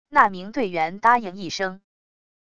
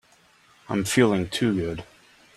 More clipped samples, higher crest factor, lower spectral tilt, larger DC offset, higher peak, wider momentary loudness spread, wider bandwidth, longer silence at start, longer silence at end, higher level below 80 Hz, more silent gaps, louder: neither; about the same, 22 dB vs 20 dB; about the same, -4 dB/octave vs -5 dB/octave; first, 0.7% vs under 0.1%; first, -2 dBFS vs -6 dBFS; about the same, 10 LU vs 11 LU; second, 11 kHz vs 15 kHz; second, 0.05 s vs 0.7 s; first, 0.7 s vs 0.55 s; second, -60 dBFS vs -54 dBFS; neither; about the same, -22 LUFS vs -24 LUFS